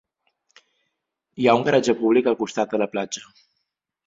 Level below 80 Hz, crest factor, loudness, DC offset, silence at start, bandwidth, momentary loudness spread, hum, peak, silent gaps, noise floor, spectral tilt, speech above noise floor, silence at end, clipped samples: -64 dBFS; 22 dB; -21 LUFS; under 0.1%; 1.35 s; 7.8 kHz; 10 LU; none; -2 dBFS; none; -78 dBFS; -5 dB/octave; 58 dB; 0.85 s; under 0.1%